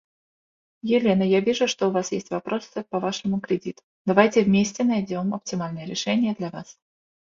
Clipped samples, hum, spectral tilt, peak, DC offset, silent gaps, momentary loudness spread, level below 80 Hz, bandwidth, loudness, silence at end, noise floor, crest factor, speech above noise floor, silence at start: under 0.1%; none; -5.5 dB/octave; 0 dBFS; under 0.1%; 3.83-4.05 s; 11 LU; -62 dBFS; 7.6 kHz; -24 LUFS; 0.6 s; under -90 dBFS; 24 dB; over 67 dB; 0.85 s